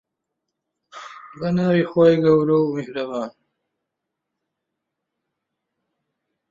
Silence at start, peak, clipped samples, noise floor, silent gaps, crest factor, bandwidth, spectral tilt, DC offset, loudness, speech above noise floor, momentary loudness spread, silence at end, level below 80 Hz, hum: 0.95 s; -4 dBFS; under 0.1%; -81 dBFS; none; 18 dB; 7.4 kHz; -8.5 dB/octave; under 0.1%; -19 LUFS; 63 dB; 23 LU; 3.2 s; -62 dBFS; none